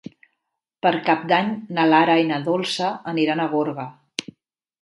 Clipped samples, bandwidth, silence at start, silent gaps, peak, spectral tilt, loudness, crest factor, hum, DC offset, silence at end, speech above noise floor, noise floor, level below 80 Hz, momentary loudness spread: under 0.1%; 11.5 kHz; 0.85 s; none; -2 dBFS; -5 dB/octave; -20 LUFS; 20 dB; none; under 0.1%; 0.6 s; 58 dB; -79 dBFS; -72 dBFS; 15 LU